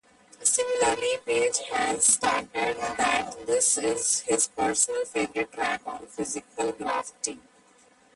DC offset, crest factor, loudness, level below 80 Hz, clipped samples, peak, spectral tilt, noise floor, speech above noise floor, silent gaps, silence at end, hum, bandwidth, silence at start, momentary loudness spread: under 0.1%; 20 dB; -25 LUFS; -62 dBFS; under 0.1%; -8 dBFS; -1 dB/octave; -59 dBFS; 32 dB; none; 0.75 s; none; 11.5 kHz; 0.4 s; 11 LU